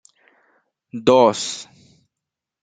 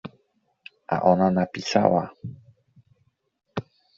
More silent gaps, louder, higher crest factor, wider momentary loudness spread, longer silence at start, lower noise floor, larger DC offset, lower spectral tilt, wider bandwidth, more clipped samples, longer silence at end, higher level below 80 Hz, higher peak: neither; first, -17 LUFS vs -22 LUFS; about the same, 20 dB vs 22 dB; about the same, 19 LU vs 21 LU; first, 0.95 s vs 0.05 s; first, -84 dBFS vs -69 dBFS; neither; second, -4 dB/octave vs -5.5 dB/octave; first, 9.4 kHz vs 7.6 kHz; neither; first, 1 s vs 0.35 s; about the same, -64 dBFS vs -64 dBFS; about the same, -2 dBFS vs -4 dBFS